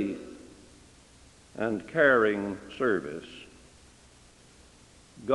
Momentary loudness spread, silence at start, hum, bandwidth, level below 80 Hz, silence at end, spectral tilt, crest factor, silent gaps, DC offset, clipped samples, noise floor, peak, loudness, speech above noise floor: 26 LU; 0 s; none; 11.5 kHz; -62 dBFS; 0 s; -5.5 dB/octave; 22 dB; none; under 0.1%; under 0.1%; -56 dBFS; -8 dBFS; -27 LUFS; 29 dB